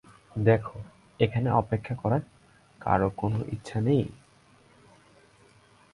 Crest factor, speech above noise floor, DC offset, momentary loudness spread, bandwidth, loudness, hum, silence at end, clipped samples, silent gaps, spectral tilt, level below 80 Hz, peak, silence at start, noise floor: 22 dB; 33 dB; under 0.1%; 14 LU; 11 kHz; -28 LUFS; none; 1.8 s; under 0.1%; none; -8.5 dB/octave; -52 dBFS; -8 dBFS; 0.35 s; -59 dBFS